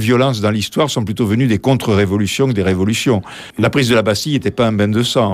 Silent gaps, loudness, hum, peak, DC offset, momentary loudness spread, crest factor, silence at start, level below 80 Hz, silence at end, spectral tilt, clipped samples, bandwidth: none; -15 LUFS; none; -2 dBFS; under 0.1%; 4 LU; 12 dB; 0 s; -46 dBFS; 0 s; -5.5 dB/octave; under 0.1%; 16 kHz